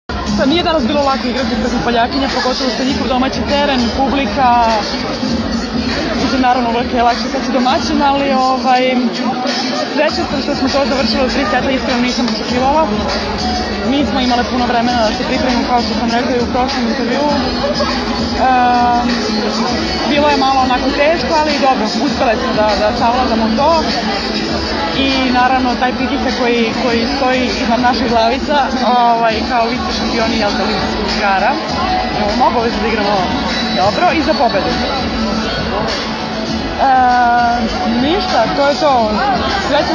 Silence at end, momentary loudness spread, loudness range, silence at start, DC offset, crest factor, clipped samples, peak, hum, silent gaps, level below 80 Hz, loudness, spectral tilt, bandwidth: 0 s; 5 LU; 2 LU; 0.1 s; under 0.1%; 14 dB; under 0.1%; 0 dBFS; none; none; -32 dBFS; -14 LUFS; -4.5 dB/octave; 9.8 kHz